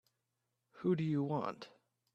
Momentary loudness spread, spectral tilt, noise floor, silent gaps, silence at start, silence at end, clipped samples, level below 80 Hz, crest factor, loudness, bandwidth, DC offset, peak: 17 LU; -9 dB/octave; -86 dBFS; none; 0.75 s; 0.45 s; under 0.1%; -80 dBFS; 18 dB; -37 LUFS; 7.8 kHz; under 0.1%; -22 dBFS